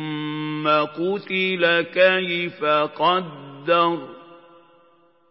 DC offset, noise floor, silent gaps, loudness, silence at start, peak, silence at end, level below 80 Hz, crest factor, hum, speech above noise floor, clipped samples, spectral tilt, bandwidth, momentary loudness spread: under 0.1%; -58 dBFS; none; -21 LUFS; 0 s; -4 dBFS; 0.95 s; -80 dBFS; 20 dB; none; 37 dB; under 0.1%; -9.5 dB/octave; 5.8 kHz; 10 LU